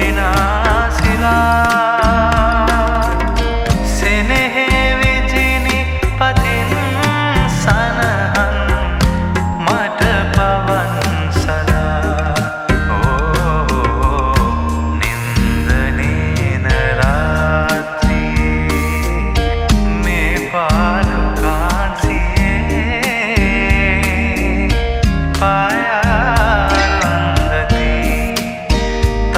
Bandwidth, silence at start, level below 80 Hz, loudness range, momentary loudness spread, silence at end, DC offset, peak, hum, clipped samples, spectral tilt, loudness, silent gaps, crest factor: 16 kHz; 0 s; -18 dBFS; 2 LU; 4 LU; 0 s; under 0.1%; 0 dBFS; none; under 0.1%; -5.5 dB/octave; -15 LUFS; none; 14 dB